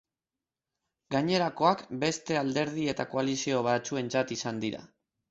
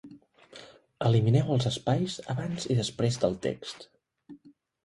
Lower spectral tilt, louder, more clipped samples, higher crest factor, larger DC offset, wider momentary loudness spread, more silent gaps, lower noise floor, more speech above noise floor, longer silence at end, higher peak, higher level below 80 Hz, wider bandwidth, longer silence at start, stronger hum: second, -4.5 dB/octave vs -6.5 dB/octave; about the same, -30 LUFS vs -28 LUFS; neither; about the same, 20 dB vs 18 dB; neither; second, 6 LU vs 21 LU; neither; first, under -90 dBFS vs -56 dBFS; first, over 61 dB vs 29 dB; about the same, 0.45 s vs 0.5 s; about the same, -10 dBFS vs -10 dBFS; second, -68 dBFS vs -58 dBFS; second, 8.2 kHz vs 11.5 kHz; first, 1.1 s vs 0.05 s; neither